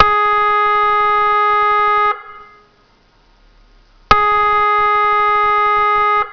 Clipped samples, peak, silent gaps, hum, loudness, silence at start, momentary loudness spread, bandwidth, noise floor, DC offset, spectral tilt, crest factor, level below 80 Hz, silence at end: 0.2%; 0 dBFS; none; none; -13 LUFS; 0 s; 2 LU; 5.4 kHz; -52 dBFS; under 0.1%; -4 dB/octave; 14 dB; -40 dBFS; 0 s